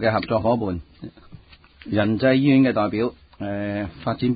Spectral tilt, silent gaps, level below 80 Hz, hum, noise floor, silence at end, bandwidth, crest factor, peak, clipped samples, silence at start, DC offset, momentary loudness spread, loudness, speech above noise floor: -12 dB/octave; none; -46 dBFS; none; -48 dBFS; 0 s; 5 kHz; 16 dB; -6 dBFS; under 0.1%; 0 s; under 0.1%; 21 LU; -21 LUFS; 27 dB